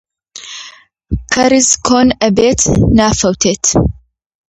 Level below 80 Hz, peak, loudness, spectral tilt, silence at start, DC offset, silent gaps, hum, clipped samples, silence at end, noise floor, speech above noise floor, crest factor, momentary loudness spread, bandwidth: -28 dBFS; 0 dBFS; -11 LUFS; -4 dB/octave; 0.35 s; under 0.1%; none; none; under 0.1%; 0.55 s; -38 dBFS; 27 dB; 12 dB; 18 LU; 10.5 kHz